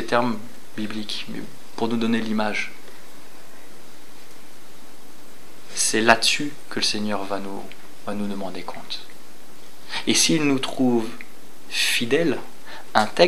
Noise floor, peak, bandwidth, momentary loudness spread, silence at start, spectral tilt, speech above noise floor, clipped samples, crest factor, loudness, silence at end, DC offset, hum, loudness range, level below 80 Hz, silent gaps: -47 dBFS; 0 dBFS; 16 kHz; 21 LU; 0 s; -3 dB/octave; 25 dB; under 0.1%; 26 dB; -23 LUFS; 0 s; 5%; none; 8 LU; -66 dBFS; none